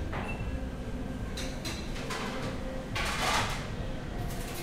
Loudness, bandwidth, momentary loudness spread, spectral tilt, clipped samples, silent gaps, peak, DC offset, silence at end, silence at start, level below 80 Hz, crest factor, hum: -35 LUFS; 16 kHz; 9 LU; -4 dB/octave; under 0.1%; none; -14 dBFS; under 0.1%; 0 s; 0 s; -40 dBFS; 20 dB; none